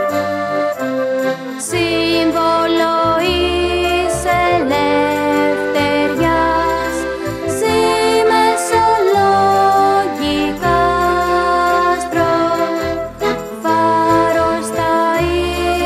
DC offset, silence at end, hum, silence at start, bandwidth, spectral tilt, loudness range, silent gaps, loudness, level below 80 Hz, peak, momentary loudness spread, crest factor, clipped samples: under 0.1%; 0 s; none; 0 s; 15.5 kHz; -4.5 dB/octave; 2 LU; none; -15 LUFS; -36 dBFS; -2 dBFS; 6 LU; 14 dB; under 0.1%